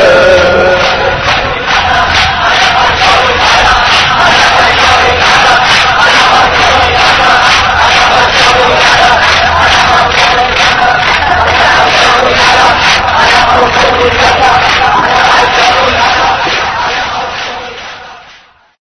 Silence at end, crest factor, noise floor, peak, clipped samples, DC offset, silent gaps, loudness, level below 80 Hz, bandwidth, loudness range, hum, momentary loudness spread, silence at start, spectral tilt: 0.65 s; 6 dB; -39 dBFS; 0 dBFS; 3%; under 0.1%; none; -5 LUFS; -26 dBFS; 11 kHz; 2 LU; none; 5 LU; 0 s; -2.5 dB/octave